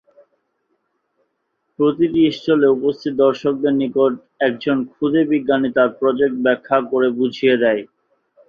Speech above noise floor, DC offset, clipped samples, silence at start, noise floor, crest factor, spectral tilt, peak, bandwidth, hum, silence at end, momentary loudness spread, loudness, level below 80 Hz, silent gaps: 55 dB; under 0.1%; under 0.1%; 1.8 s; -71 dBFS; 16 dB; -7.5 dB/octave; -2 dBFS; 6.8 kHz; none; 0.65 s; 4 LU; -17 LUFS; -60 dBFS; none